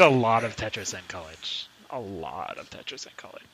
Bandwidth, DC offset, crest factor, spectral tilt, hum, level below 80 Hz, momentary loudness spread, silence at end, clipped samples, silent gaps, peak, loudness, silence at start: 15.5 kHz; under 0.1%; 24 dB; -4.5 dB/octave; none; -58 dBFS; 16 LU; 0.15 s; under 0.1%; none; -2 dBFS; -29 LUFS; 0 s